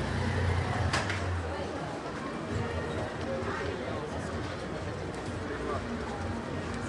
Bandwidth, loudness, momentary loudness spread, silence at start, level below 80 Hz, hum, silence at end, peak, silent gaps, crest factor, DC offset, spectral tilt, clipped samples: 11.5 kHz; -34 LUFS; 7 LU; 0 s; -48 dBFS; none; 0 s; -14 dBFS; none; 18 dB; under 0.1%; -6 dB/octave; under 0.1%